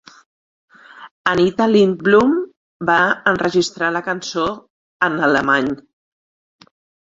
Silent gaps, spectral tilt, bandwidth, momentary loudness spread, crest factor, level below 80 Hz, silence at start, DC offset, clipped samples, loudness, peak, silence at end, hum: 1.11-1.25 s, 2.57-2.80 s, 4.70-5.00 s; -5 dB/octave; 7.8 kHz; 10 LU; 18 dB; -54 dBFS; 0.95 s; under 0.1%; under 0.1%; -17 LUFS; 0 dBFS; 1.25 s; none